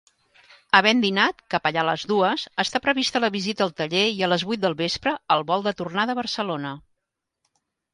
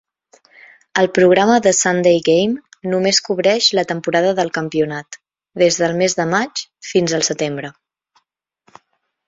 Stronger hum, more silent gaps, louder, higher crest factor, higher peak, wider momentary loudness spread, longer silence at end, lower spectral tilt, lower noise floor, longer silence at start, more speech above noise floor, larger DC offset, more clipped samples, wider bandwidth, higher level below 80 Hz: neither; neither; second, -22 LUFS vs -16 LUFS; first, 24 dB vs 16 dB; about the same, 0 dBFS vs -2 dBFS; second, 7 LU vs 12 LU; second, 1.15 s vs 1.55 s; about the same, -4 dB/octave vs -3.5 dB/octave; first, -82 dBFS vs -68 dBFS; second, 0.75 s vs 0.95 s; first, 59 dB vs 53 dB; neither; neither; first, 11.5 kHz vs 8 kHz; about the same, -62 dBFS vs -60 dBFS